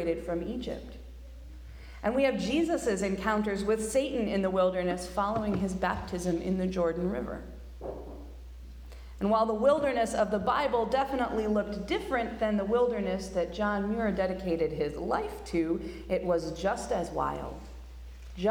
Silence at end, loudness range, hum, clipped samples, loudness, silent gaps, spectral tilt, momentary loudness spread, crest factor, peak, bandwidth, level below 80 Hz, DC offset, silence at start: 0 s; 4 LU; none; under 0.1%; -30 LUFS; none; -6 dB/octave; 20 LU; 16 dB; -14 dBFS; 18.5 kHz; -46 dBFS; under 0.1%; 0 s